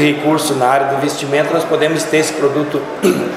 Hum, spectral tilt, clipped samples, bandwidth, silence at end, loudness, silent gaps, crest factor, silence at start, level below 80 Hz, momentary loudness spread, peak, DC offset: none; -4.5 dB/octave; under 0.1%; 16 kHz; 0 s; -15 LUFS; none; 14 dB; 0 s; -58 dBFS; 3 LU; 0 dBFS; under 0.1%